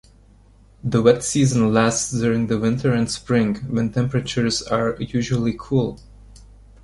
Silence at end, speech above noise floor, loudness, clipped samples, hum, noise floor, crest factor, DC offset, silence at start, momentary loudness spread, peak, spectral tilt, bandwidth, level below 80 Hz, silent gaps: 0.85 s; 31 dB; -20 LUFS; under 0.1%; none; -50 dBFS; 18 dB; under 0.1%; 0.85 s; 6 LU; -2 dBFS; -5.5 dB/octave; 11.5 kHz; -46 dBFS; none